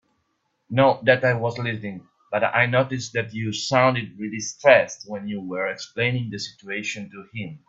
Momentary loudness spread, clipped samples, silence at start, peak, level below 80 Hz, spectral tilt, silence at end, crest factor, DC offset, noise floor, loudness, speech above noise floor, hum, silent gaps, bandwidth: 15 LU; under 0.1%; 0.7 s; 0 dBFS; -64 dBFS; -5 dB/octave; 0.1 s; 22 dB; under 0.1%; -72 dBFS; -22 LUFS; 49 dB; none; none; 7.8 kHz